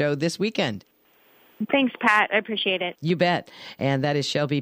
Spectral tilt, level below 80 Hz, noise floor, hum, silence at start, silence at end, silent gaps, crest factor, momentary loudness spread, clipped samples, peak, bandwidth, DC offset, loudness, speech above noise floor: -5 dB/octave; -68 dBFS; -59 dBFS; none; 0 s; 0 s; none; 18 dB; 9 LU; under 0.1%; -6 dBFS; 15.5 kHz; under 0.1%; -23 LUFS; 35 dB